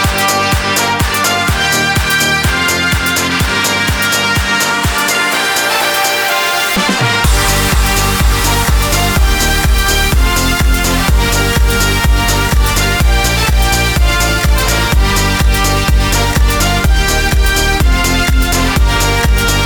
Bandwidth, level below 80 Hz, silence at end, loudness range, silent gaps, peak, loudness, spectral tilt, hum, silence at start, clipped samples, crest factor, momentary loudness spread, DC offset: over 20 kHz; -14 dBFS; 0 s; 0 LU; none; 0 dBFS; -11 LUFS; -3.5 dB/octave; none; 0 s; under 0.1%; 10 dB; 1 LU; under 0.1%